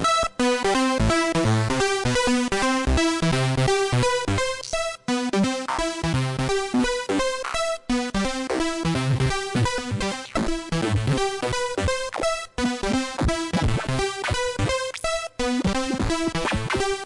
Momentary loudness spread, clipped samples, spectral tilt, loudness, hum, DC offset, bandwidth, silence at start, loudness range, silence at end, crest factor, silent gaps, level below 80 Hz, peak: 5 LU; under 0.1%; -4.5 dB/octave; -24 LUFS; none; under 0.1%; 11.5 kHz; 0 s; 4 LU; 0 s; 10 dB; none; -36 dBFS; -12 dBFS